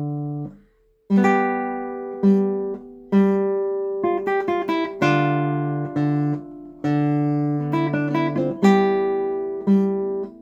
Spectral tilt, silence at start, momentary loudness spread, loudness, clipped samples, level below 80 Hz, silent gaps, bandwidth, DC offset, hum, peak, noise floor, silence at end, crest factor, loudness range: -8.5 dB/octave; 0 s; 10 LU; -21 LUFS; under 0.1%; -60 dBFS; none; 7.6 kHz; under 0.1%; none; -2 dBFS; -58 dBFS; 0.05 s; 18 dB; 2 LU